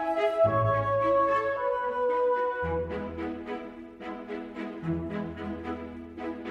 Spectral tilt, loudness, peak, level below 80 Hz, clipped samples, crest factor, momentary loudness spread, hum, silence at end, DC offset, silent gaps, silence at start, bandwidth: -8 dB/octave; -29 LUFS; -14 dBFS; -52 dBFS; under 0.1%; 16 dB; 14 LU; none; 0 s; under 0.1%; none; 0 s; 8.4 kHz